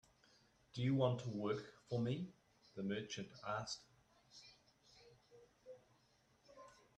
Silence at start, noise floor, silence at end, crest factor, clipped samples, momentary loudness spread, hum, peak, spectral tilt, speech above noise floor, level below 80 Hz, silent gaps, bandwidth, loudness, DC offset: 0.75 s; -75 dBFS; 0.25 s; 24 dB; under 0.1%; 24 LU; none; -22 dBFS; -6 dB/octave; 33 dB; -78 dBFS; none; 9.4 kHz; -43 LUFS; under 0.1%